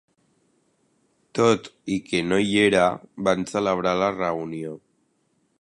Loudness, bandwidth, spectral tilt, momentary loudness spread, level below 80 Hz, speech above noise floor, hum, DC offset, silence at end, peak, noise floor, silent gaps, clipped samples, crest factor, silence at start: -23 LUFS; 11.5 kHz; -5 dB/octave; 14 LU; -58 dBFS; 46 dB; none; under 0.1%; 0.85 s; -4 dBFS; -68 dBFS; none; under 0.1%; 20 dB; 1.35 s